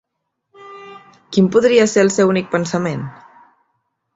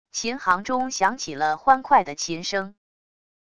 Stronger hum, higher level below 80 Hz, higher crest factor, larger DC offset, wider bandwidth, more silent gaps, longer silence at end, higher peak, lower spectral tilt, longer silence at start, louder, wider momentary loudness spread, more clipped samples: neither; about the same, -58 dBFS vs -60 dBFS; about the same, 16 dB vs 20 dB; second, under 0.1% vs 0.4%; second, 8 kHz vs 11 kHz; neither; first, 1.05 s vs 0.75 s; about the same, -2 dBFS vs -4 dBFS; first, -5.5 dB/octave vs -2.5 dB/octave; first, 0.6 s vs 0.15 s; first, -15 LUFS vs -23 LUFS; first, 23 LU vs 10 LU; neither